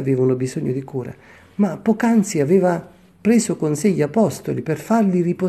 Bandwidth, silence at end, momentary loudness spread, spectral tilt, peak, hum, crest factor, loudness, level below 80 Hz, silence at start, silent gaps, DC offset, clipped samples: 13 kHz; 0 s; 9 LU; -6.5 dB/octave; -4 dBFS; none; 14 dB; -19 LUFS; -60 dBFS; 0 s; none; under 0.1%; under 0.1%